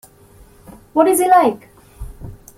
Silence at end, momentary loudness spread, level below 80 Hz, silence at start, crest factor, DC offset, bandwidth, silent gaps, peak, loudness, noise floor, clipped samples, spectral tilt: 0.25 s; 25 LU; -42 dBFS; 0.95 s; 16 dB; under 0.1%; 16 kHz; none; -2 dBFS; -14 LUFS; -46 dBFS; under 0.1%; -4.5 dB/octave